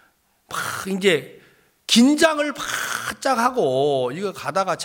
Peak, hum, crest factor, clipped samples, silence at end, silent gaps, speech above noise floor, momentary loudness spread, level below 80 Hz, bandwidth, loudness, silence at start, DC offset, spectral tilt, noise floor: -2 dBFS; none; 20 dB; under 0.1%; 0 s; none; 40 dB; 11 LU; -60 dBFS; 17 kHz; -20 LUFS; 0.5 s; under 0.1%; -3.5 dB/octave; -60 dBFS